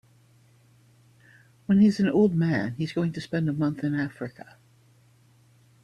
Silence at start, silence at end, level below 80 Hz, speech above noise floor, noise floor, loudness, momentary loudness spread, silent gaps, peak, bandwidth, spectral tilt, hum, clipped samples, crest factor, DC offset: 1.7 s; 1.55 s; -64 dBFS; 35 dB; -59 dBFS; -25 LUFS; 13 LU; none; -10 dBFS; 10 kHz; -8 dB/octave; none; under 0.1%; 16 dB; under 0.1%